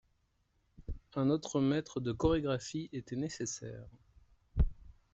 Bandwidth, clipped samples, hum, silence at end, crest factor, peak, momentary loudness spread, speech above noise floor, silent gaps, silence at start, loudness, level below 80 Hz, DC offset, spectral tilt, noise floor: 8.2 kHz; under 0.1%; none; 0.2 s; 20 dB; -16 dBFS; 16 LU; 41 dB; none; 0.8 s; -35 LUFS; -44 dBFS; under 0.1%; -6 dB/octave; -76 dBFS